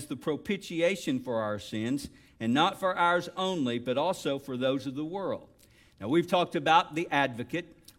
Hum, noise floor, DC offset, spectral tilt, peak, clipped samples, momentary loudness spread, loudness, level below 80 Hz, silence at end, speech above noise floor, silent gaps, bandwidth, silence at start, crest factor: none; -59 dBFS; under 0.1%; -5 dB/octave; -10 dBFS; under 0.1%; 10 LU; -29 LUFS; -64 dBFS; 0.25 s; 30 dB; none; 16.5 kHz; 0 s; 20 dB